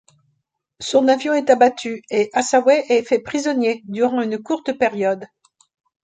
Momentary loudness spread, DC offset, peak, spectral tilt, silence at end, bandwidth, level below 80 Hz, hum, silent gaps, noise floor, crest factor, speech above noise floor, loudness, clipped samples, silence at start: 8 LU; under 0.1%; -2 dBFS; -4 dB/octave; 0.8 s; 9.4 kHz; -64 dBFS; none; none; -72 dBFS; 18 dB; 54 dB; -18 LUFS; under 0.1%; 0.8 s